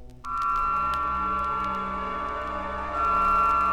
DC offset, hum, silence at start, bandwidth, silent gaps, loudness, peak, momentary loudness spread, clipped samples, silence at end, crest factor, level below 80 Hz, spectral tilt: 0.3%; none; 0 s; 14 kHz; none; -26 LUFS; -12 dBFS; 10 LU; under 0.1%; 0 s; 14 dB; -42 dBFS; -5.5 dB/octave